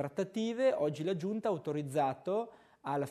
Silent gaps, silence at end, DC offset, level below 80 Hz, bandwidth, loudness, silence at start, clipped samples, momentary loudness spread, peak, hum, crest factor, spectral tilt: none; 0 s; under 0.1%; -78 dBFS; 13.5 kHz; -34 LUFS; 0 s; under 0.1%; 7 LU; -20 dBFS; none; 16 dB; -6.5 dB/octave